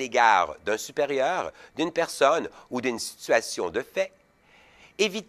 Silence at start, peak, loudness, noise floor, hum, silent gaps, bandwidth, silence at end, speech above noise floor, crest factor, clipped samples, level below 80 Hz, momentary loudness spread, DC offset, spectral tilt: 0 s; -6 dBFS; -26 LUFS; -58 dBFS; none; none; 14.5 kHz; 0.05 s; 32 dB; 20 dB; under 0.1%; -64 dBFS; 12 LU; under 0.1%; -2.5 dB/octave